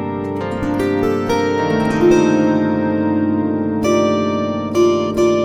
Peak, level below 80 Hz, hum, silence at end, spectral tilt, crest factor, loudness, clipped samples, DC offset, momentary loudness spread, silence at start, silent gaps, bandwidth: -2 dBFS; -42 dBFS; none; 0 s; -6.5 dB/octave; 14 dB; -16 LUFS; under 0.1%; under 0.1%; 7 LU; 0 s; none; 14 kHz